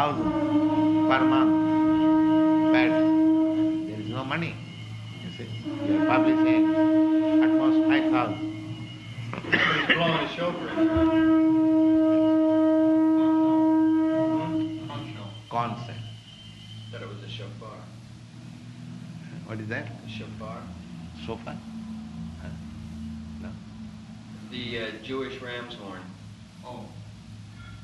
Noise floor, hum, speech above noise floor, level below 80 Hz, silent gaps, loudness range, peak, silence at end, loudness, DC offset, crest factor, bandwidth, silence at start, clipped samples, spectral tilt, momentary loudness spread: -45 dBFS; none; 20 dB; -54 dBFS; none; 17 LU; -6 dBFS; 0 s; -23 LUFS; under 0.1%; 20 dB; 6.8 kHz; 0 s; under 0.1%; -7 dB/octave; 21 LU